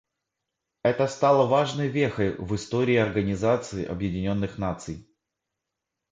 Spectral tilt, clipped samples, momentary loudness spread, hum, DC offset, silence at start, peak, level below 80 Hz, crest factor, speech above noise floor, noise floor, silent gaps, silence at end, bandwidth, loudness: -6.5 dB/octave; under 0.1%; 10 LU; none; under 0.1%; 0.85 s; -8 dBFS; -50 dBFS; 18 dB; 60 dB; -85 dBFS; none; 1.1 s; 9.4 kHz; -25 LUFS